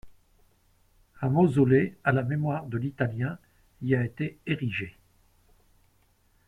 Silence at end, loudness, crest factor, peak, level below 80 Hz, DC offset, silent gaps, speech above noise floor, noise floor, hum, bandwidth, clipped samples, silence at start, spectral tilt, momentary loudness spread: 1.6 s; -27 LUFS; 18 dB; -10 dBFS; -58 dBFS; under 0.1%; none; 40 dB; -66 dBFS; none; 10 kHz; under 0.1%; 0.05 s; -9 dB/octave; 12 LU